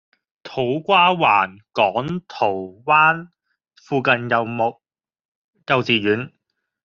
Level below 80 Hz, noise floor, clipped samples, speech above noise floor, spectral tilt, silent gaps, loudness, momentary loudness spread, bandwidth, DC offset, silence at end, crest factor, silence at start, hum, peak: -62 dBFS; -75 dBFS; under 0.1%; 56 dB; -2.5 dB/octave; 5.25-5.53 s; -19 LUFS; 13 LU; 7.2 kHz; under 0.1%; 0.55 s; 18 dB; 0.45 s; none; -2 dBFS